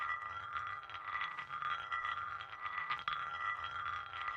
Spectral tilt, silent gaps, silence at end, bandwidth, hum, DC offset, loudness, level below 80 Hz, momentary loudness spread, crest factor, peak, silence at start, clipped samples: -2.5 dB/octave; none; 0 s; 9.6 kHz; none; under 0.1%; -41 LUFS; -72 dBFS; 4 LU; 20 dB; -20 dBFS; 0 s; under 0.1%